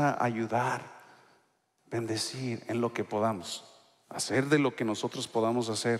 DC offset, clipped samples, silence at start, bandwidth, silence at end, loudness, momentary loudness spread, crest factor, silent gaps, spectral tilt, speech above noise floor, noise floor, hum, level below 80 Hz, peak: under 0.1%; under 0.1%; 0 s; 15 kHz; 0 s; -31 LUFS; 11 LU; 20 dB; none; -4.5 dB/octave; 41 dB; -71 dBFS; none; -76 dBFS; -12 dBFS